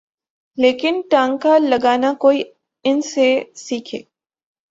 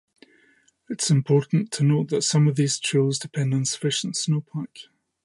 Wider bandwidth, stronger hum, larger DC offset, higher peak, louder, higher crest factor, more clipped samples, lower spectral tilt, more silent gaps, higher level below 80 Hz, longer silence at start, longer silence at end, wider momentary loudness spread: second, 7.8 kHz vs 11.5 kHz; neither; neither; first, -2 dBFS vs -8 dBFS; first, -17 LUFS vs -23 LUFS; about the same, 16 dB vs 16 dB; neither; second, -3.5 dB/octave vs -5 dB/octave; neither; first, -64 dBFS vs -70 dBFS; second, 0.55 s vs 0.9 s; first, 0.7 s vs 0.45 s; first, 13 LU vs 7 LU